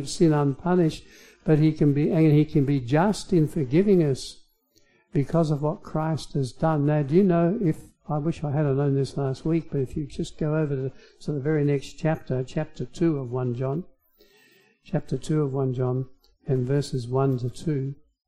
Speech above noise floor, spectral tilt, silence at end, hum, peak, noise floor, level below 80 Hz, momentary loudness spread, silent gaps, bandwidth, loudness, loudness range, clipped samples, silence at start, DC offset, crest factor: 39 dB; -8 dB/octave; 0.35 s; none; -8 dBFS; -63 dBFS; -48 dBFS; 11 LU; none; 11.5 kHz; -25 LUFS; 7 LU; under 0.1%; 0 s; under 0.1%; 16 dB